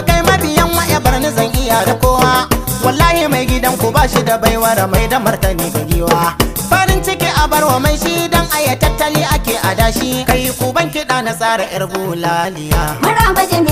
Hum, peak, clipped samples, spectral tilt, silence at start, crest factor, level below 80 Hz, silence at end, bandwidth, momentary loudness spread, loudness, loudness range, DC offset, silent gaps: none; 0 dBFS; under 0.1%; -4 dB/octave; 0 s; 12 dB; -22 dBFS; 0 s; 16.5 kHz; 5 LU; -13 LUFS; 3 LU; under 0.1%; none